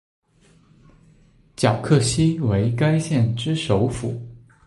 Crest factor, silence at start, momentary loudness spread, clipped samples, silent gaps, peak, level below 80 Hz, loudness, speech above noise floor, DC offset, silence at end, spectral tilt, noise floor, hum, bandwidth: 18 dB; 1.6 s; 11 LU; under 0.1%; none; -4 dBFS; -44 dBFS; -21 LUFS; 36 dB; under 0.1%; 0.3 s; -6 dB/octave; -55 dBFS; none; 11.5 kHz